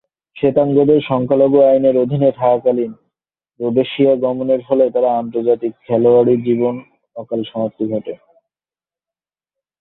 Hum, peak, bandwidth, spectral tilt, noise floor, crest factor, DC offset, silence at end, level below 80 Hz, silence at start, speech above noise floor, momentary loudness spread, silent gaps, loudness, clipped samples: none; -2 dBFS; 4.1 kHz; -11.5 dB/octave; under -90 dBFS; 14 dB; under 0.1%; 1.65 s; -56 dBFS; 0.35 s; over 76 dB; 13 LU; none; -15 LUFS; under 0.1%